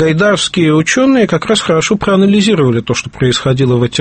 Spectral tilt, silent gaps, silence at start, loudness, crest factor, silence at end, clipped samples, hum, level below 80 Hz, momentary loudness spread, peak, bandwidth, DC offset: -5 dB/octave; none; 0 s; -11 LUFS; 10 dB; 0 s; under 0.1%; none; -40 dBFS; 4 LU; 0 dBFS; 8.8 kHz; under 0.1%